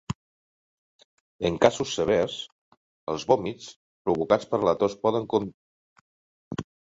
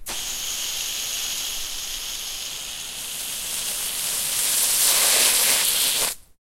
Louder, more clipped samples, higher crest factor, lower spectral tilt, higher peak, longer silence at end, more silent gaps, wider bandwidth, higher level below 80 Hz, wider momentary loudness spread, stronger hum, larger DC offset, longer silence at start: second, -25 LUFS vs -21 LUFS; neither; about the same, 24 dB vs 20 dB; first, -5 dB/octave vs 2 dB/octave; about the same, -4 dBFS vs -4 dBFS; about the same, 0.3 s vs 0.2 s; first, 0.15-1.39 s, 2.52-3.07 s, 3.76-4.05 s, 5.54-6.51 s vs none; second, 8 kHz vs 16 kHz; second, -56 dBFS vs -48 dBFS; first, 16 LU vs 13 LU; neither; neither; about the same, 0.1 s vs 0 s